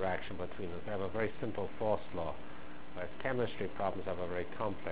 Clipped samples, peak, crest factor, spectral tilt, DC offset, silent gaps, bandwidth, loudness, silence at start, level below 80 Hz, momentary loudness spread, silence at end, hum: under 0.1%; -20 dBFS; 20 dB; -5 dB/octave; 1%; none; 4 kHz; -39 LUFS; 0 s; -56 dBFS; 9 LU; 0 s; none